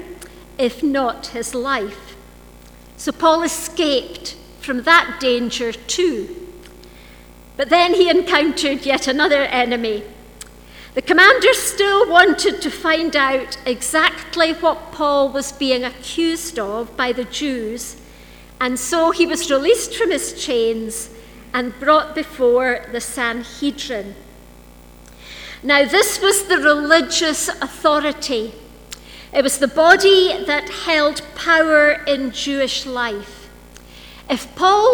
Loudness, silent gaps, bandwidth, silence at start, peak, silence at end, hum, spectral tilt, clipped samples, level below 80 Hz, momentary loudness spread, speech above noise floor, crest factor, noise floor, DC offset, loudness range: -17 LUFS; none; over 20 kHz; 0 s; 0 dBFS; 0 s; 60 Hz at -50 dBFS; -2 dB/octave; under 0.1%; -46 dBFS; 15 LU; 25 dB; 18 dB; -42 dBFS; under 0.1%; 7 LU